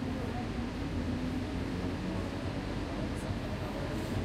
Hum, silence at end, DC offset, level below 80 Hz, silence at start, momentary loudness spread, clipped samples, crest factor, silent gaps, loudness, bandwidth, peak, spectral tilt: none; 0 s; under 0.1%; -44 dBFS; 0 s; 2 LU; under 0.1%; 12 dB; none; -36 LUFS; 15 kHz; -22 dBFS; -6.5 dB/octave